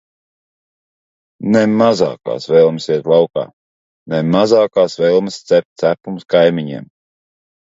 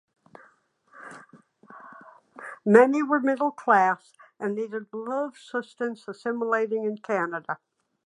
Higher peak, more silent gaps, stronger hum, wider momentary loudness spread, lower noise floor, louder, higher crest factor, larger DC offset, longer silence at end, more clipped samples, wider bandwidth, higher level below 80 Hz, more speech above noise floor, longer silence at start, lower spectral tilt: about the same, 0 dBFS vs -2 dBFS; first, 3.53-4.06 s, 5.65-5.76 s vs none; neither; second, 11 LU vs 24 LU; first, under -90 dBFS vs -62 dBFS; first, -14 LUFS vs -25 LUFS; second, 16 dB vs 26 dB; neither; first, 0.8 s vs 0.5 s; neither; second, 7.8 kHz vs 10.5 kHz; first, -58 dBFS vs -82 dBFS; first, over 76 dB vs 37 dB; first, 1.4 s vs 0.95 s; about the same, -6.5 dB/octave vs -7 dB/octave